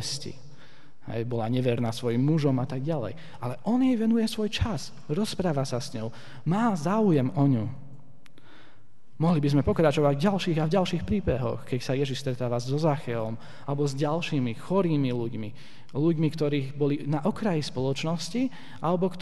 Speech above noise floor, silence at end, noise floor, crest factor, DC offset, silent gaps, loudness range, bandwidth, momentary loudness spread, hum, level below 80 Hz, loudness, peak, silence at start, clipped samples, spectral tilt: 33 dB; 0 s; -60 dBFS; 20 dB; 1%; none; 3 LU; 12 kHz; 12 LU; none; -50 dBFS; -27 LUFS; -8 dBFS; 0 s; under 0.1%; -7 dB/octave